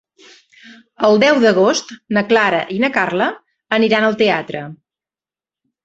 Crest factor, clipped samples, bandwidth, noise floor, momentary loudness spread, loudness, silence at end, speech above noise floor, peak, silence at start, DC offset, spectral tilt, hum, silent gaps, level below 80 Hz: 16 dB; under 0.1%; 8 kHz; under -90 dBFS; 9 LU; -15 LUFS; 1.1 s; over 75 dB; 0 dBFS; 0.65 s; under 0.1%; -4.5 dB/octave; none; none; -60 dBFS